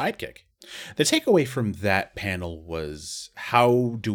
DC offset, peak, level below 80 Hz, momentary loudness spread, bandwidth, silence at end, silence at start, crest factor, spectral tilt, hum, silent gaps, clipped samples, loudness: under 0.1%; -4 dBFS; -52 dBFS; 16 LU; 19 kHz; 0 s; 0 s; 22 dB; -4.5 dB/octave; none; none; under 0.1%; -24 LUFS